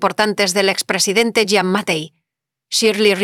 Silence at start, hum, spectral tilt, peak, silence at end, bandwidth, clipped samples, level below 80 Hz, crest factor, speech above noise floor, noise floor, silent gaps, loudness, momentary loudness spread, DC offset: 0 s; none; -3 dB/octave; -2 dBFS; 0 s; 17.5 kHz; under 0.1%; -62 dBFS; 14 dB; 65 dB; -81 dBFS; none; -16 LUFS; 7 LU; under 0.1%